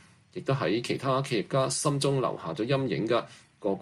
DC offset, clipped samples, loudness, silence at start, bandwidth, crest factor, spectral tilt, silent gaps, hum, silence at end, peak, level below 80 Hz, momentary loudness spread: under 0.1%; under 0.1%; -29 LUFS; 0.35 s; 12.5 kHz; 16 dB; -5 dB/octave; none; none; 0 s; -12 dBFS; -66 dBFS; 8 LU